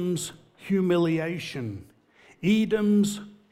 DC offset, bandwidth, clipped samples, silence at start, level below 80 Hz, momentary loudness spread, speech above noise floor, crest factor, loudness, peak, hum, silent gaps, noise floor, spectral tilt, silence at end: under 0.1%; 14.5 kHz; under 0.1%; 0 s; -64 dBFS; 14 LU; 33 dB; 14 dB; -25 LUFS; -12 dBFS; none; none; -57 dBFS; -6 dB/octave; 0.2 s